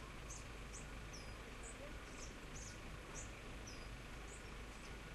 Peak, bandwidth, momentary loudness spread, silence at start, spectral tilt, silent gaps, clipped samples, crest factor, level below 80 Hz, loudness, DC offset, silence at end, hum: -36 dBFS; 13 kHz; 2 LU; 0 s; -3.5 dB/octave; none; under 0.1%; 16 dB; -56 dBFS; -52 LUFS; under 0.1%; 0 s; none